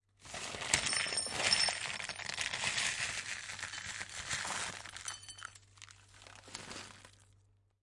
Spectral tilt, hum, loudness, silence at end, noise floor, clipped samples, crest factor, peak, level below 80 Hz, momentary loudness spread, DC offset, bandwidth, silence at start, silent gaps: 0 dB/octave; none; -35 LUFS; 0.6 s; -69 dBFS; under 0.1%; 30 dB; -10 dBFS; -66 dBFS; 24 LU; under 0.1%; 11.5 kHz; 0.2 s; none